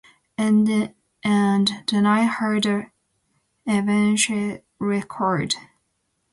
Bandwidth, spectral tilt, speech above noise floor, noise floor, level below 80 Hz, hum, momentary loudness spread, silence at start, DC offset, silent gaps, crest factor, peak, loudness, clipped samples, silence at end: 11.5 kHz; -4.5 dB/octave; 52 dB; -72 dBFS; -62 dBFS; none; 10 LU; 0.4 s; under 0.1%; none; 16 dB; -6 dBFS; -21 LUFS; under 0.1%; 0.7 s